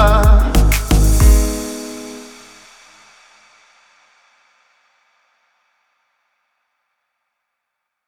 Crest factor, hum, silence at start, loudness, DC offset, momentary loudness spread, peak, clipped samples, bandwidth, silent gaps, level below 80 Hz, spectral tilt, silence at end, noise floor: 18 dB; none; 0 s; -15 LUFS; under 0.1%; 22 LU; 0 dBFS; under 0.1%; 18 kHz; none; -18 dBFS; -5.5 dB/octave; 5.85 s; -77 dBFS